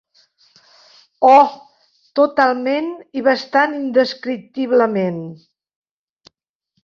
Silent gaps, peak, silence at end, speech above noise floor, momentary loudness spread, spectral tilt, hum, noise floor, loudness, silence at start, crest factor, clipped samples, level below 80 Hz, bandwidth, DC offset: none; -2 dBFS; 1.5 s; 57 dB; 14 LU; -6 dB/octave; none; -72 dBFS; -16 LUFS; 1.2 s; 18 dB; under 0.1%; -68 dBFS; 7.2 kHz; under 0.1%